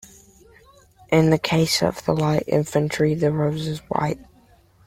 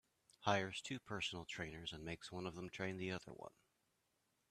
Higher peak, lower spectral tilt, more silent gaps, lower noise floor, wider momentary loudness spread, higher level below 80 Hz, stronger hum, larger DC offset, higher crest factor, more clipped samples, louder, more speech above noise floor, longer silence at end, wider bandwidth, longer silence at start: first, -4 dBFS vs -20 dBFS; about the same, -5.5 dB/octave vs -4.5 dB/octave; neither; second, -55 dBFS vs -84 dBFS; second, 7 LU vs 10 LU; first, -50 dBFS vs -72 dBFS; neither; neither; second, 18 dB vs 26 dB; neither; first, -21 LUFS vs -45 LUFS; second, 34 dB vs 38 dB; second, 0.65 s vs 1 s; first, 16 kHz vs 14 kHz; first, 1.1 s vs 0.4 s